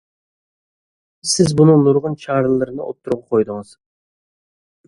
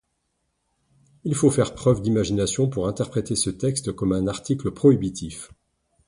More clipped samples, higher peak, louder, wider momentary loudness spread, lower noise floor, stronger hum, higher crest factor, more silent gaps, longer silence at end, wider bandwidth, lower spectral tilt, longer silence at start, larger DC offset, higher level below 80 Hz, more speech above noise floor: neither; first, 0 dBFS vs -4 dBFS; first, -16 LUFS vs -23 LUFS; first, 14 LU vs 10 LU; first, under -90 dBFS vs -74 dBFS; neither; about the same, 18 dB vs 20 dB; neither; first, 1.25 s vs 0.6 s; about the same, 11.5 kHz vs 11.5 kHz; about the same, -6 dB/octave vs -6 dB/octave; about the same, 1.25 s vs 1.25 s; neither; second, -52 dBFS vs -46 dBFS; first, over 74 dB vs 52 dB